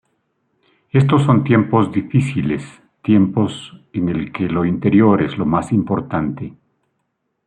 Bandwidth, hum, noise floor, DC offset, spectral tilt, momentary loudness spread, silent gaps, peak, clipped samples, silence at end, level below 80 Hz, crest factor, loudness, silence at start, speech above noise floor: 9.8 kHz; none; -71 dBFS; under 0.1%; -8.5 dB/octave; 12 LU; none; -2 dBFS; under 0.1%; 0.95 s; -50 dBFS; 16 dB; -17 LUFS; 0.95 s; 55 dB